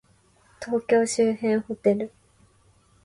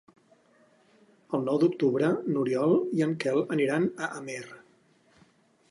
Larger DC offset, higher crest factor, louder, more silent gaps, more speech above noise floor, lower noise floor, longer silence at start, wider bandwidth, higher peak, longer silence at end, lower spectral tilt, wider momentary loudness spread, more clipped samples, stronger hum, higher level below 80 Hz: neither; about the same, 16 dB vs 16 dB; first, -24 LUFS vs -27 LUFS; neither; about the same, 37 dB vs 37 dB; about the same, -60 dBFS vs -63 dBFS; second, 0.6 s vs 1.3 s; about the same, 11.5 kHz vs 11.5 kHz; about the same, -10 dBFS vs -12 dBFS; second, 0.95 s vs 1.15 s; second, -5 dB/octave vs -7 dB/octave; about the same, 10 LU vs 12 LU; neither; neither; first, -64 dBFS vs -78 dBFS